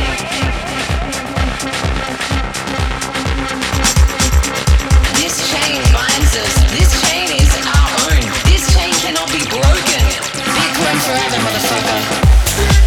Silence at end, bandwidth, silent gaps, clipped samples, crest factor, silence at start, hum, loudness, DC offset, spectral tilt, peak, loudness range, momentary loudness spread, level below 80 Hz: 0 s; 18 kHz; none; under 0.1%; 12 dB; 0 s; none; -14 LUFS; under 0.1%; -3.5 dB/octave; 0 dBFS; 5 LU; 7 LU; -16 dBFS